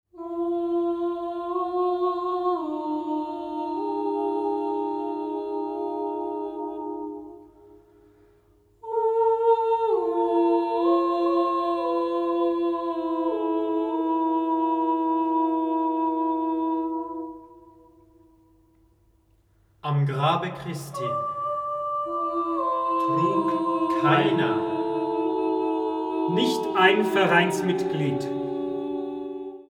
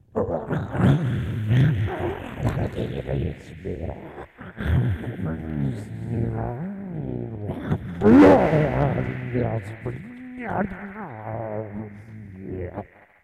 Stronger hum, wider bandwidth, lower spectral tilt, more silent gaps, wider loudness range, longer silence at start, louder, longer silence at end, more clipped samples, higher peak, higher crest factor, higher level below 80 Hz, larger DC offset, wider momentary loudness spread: neither; first, 13 kHz vs 10 kHz; second, -6.5 dB/octave vs -9 dB/octave; neither; second, 8 LU vs 11 LU; about the same, 0.15 s vs 0.15 s; about the same, -25 LUFS vs -24 LUFS; second, 0.1 s vs 0.4 s; neither; about the same, -4 dBFS vs -6 dBFS; about the same, 20 dB vs 18 dB; second, -66 dBFS vs -40 dBFS; neither; second, 10 LU vs 16 LU